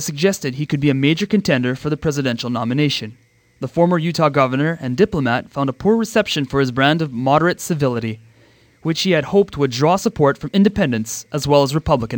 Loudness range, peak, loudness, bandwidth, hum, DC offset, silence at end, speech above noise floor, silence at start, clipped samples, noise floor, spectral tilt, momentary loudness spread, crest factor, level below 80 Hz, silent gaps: 2 LU; -2 dBFS; -18 LUFS; 19 kHz; none; under 0.1%; 0 s; 34 dB; 0 s; under 0.1%; -52 dBFS; -5.5 dB/octave; 7 LU; 16 dB; -44 dBFS; none